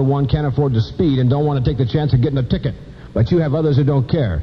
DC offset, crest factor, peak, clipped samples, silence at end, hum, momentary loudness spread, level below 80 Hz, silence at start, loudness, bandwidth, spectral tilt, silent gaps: 0.2%; 14 dB; -2 dBFS; under 0.1%; 0 s; none; 5 LU; -32 dBFS; 0 s; -17 LUFS; 6 kHz; -10 dB/octave; none